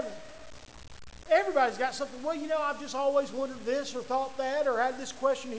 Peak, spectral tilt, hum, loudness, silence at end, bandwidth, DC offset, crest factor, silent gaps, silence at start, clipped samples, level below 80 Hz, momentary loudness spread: -14 dBFS; -3 dB/octave; none; -30 LUFS; 0 s; 8 kHz; 0.4%; 18 dB; none; 0 s; under 0.1%; -60 dBFS; 22 LU